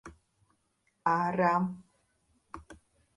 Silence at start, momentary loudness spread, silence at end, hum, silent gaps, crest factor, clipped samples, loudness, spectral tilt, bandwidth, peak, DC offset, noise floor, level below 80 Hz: 0.05 s; 23 LU; 0.4 s; none; none; 20 dB; under 0.1%; -29 LUFS; -7.5 dB/octave; 11.5 kHz; -14 dBFS; under 0.1%; -76 dBFS; -64 dBFS